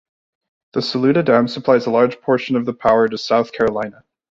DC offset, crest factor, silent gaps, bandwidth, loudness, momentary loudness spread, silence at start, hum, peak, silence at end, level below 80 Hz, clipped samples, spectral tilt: under 0.1%; 16 dB; none; 7.6 kHz; -17 LUFS; 8 LU; 0.75 s; none; -2 dBFS; 0.4 s; -54 dBFS; under 0.1%; -6.5 dB/octave